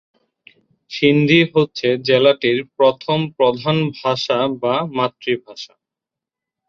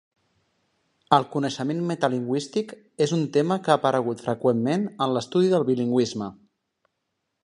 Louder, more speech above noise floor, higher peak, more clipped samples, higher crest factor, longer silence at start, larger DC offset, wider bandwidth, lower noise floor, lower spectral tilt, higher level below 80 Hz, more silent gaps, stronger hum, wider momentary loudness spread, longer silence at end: first, -17 LUFS vs -24 LUFS; first, 69 dB vs 55 dB; about the same, -2 dBFS vs -2 dBFS; neither; second, 16 dB vs 22 dB; second, 0.9 s vs 1.1 s; neither; second, 7.4 kHz vs 11.5 kHz; first, -86 dBFS vs -79 dBFS; about the same, -6.5 dB/octave vs -6 dB/octave; first, -60 dBFS vs -68 dBFS; neither; neither; first, 10 LU vs 7 LU; about the same, 1.05 s vs 1.1 s